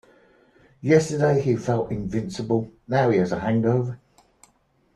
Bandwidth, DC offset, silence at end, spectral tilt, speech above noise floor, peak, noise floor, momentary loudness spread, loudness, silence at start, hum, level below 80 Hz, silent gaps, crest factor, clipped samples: 12 kHz; under 0.1%; 1 s; -7 dB/octave; 42 dB; -4 dBFS; -64 dBFS; 9 LU; -23 LUFS; 0.85 s; none; -54 dBFS; none; 18 dB; under 0.1%